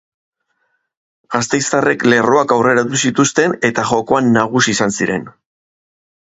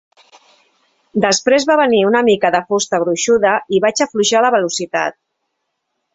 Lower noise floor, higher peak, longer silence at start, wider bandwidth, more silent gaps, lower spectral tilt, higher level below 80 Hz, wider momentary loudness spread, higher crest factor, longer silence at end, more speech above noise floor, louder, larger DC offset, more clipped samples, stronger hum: second, -66 dBFS vs -73 dBFS; about the same, 0 dBFS vs 0 dBFS; first, 1.3 s vs 1.15 s; about the same, 8 kHz vs 8.4 kHz; neither; about the same, -4 dB/octave vs -3 dB/octave; first, -54 dBFS vs -60 dBFS; about the same, 6 LU vs 6 LU; about the same, 16 dB vs 14 dB; about the same, 1 s vs 1.05 s; second, 52 dB vs 59 dB; about the same, -14 LUFS vs -14 LUFS; neither; neither; neither